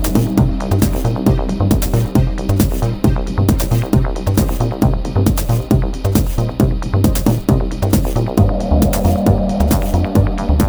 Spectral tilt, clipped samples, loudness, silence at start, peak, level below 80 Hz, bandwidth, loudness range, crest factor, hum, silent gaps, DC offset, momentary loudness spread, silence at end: -7 dB/octave; under 0.1%; -16 LUFS; 0 s; 0 dBFS; -20 dBFS; over 20 kHz; 1 LU; 14 dB; none; none; under 0.1%; 2 LU; 0 s